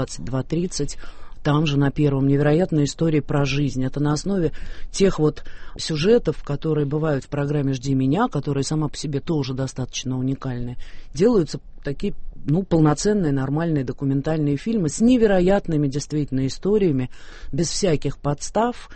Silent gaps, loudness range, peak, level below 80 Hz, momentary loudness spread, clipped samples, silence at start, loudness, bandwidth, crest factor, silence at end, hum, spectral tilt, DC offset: none; 4 LU; -6 dBFS; -36 dBFS; 11 LU; under 0.1%; 0 s; -22 LUFS; 8.8 kHz; 16 dB; 0 s; none; -6.5 dB/octave; under 0.1%